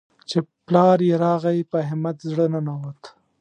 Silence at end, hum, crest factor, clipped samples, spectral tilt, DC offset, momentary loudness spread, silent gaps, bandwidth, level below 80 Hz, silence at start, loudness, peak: 0.3 s; none; 18 dB; under 0.1%; -8 dB/octave; under 0.1%; 11 LU; none; 9.4 kHz; -70 dBFS; 0.3 s; -21 LUFS; -2 dBFS